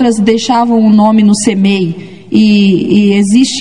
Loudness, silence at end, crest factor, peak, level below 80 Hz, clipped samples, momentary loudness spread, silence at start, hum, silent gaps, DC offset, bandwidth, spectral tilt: -9 LUFS; 0 s; 8 dB; 0 dBFS; -50 dBFS; 0.3%; 6 LU; 0 s; none; none; 1%; 11 kHz; -5.5 dB/octave